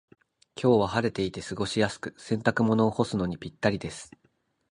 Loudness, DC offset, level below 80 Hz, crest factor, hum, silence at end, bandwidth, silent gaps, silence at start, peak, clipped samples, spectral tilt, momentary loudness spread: -27 LUFS; under 0.1%; -54 dBFS; 22 dB; none; 0.65 s; 11 kHz; none; 0.55 s; -6 dBFS; under 0.1%; -6 dB/octave; 12 LU